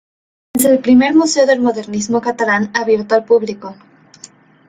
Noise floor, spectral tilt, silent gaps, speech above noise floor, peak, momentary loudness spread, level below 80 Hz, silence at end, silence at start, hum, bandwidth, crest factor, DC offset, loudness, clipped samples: -42 dBFS; -4 dB/octave; none; 29 dB; 0 dBFS; 12 LU; -56 dBFS; 0.95 s; 0.55 s; none; 16.5 kHz; 14 dB; under 0.1%; -14 LUFS; under 0.1%